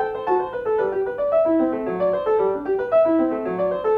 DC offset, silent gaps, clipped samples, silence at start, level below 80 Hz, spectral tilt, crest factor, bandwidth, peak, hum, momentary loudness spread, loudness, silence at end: under 0.1%; none; under 0.1%; 0 s; -54 dBFS; -9 dB/octave; 12 dB; 4.9 kHz; -8 dBFS; none; 5 LU; -21 LUFS; 0 s